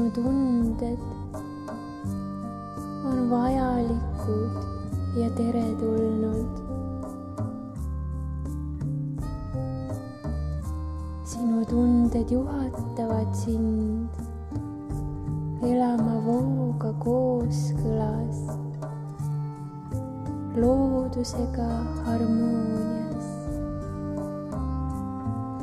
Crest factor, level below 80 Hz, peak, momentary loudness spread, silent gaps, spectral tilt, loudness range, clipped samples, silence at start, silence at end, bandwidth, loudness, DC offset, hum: 16 dB; -38 dBFS; -10 dBFS; 11 LU; none; -8.5 dB/octave; 6 LU; under 0.1%; 0 s; 0 s; 12.5 kHz; -28 LUFS; under 0.1%; none